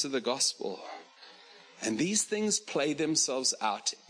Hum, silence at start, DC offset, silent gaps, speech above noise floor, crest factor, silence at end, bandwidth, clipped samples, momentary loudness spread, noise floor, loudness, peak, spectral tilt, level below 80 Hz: none; 0 s; under 0.1%; none; 24 dB; 18 dB; 0.15 s; 10.5 kHz; under 0.1%; 11 LU; -55 dBFS; -29 LUFS; -14 dBFS; -2 dB/octave; -78 dBFS